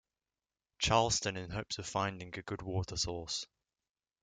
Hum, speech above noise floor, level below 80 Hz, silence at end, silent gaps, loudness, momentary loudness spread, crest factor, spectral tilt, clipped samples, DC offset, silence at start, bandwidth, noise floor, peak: none; over 54 dB; -56 dBFS; 0.8 s; none; -35 LUFS; 12 LU; 24 dB; -3 dB/octave; under 0.1%; under 0.1%; 0.8 s; 9.6 kHz; under -90 dBFS; -14 dBFS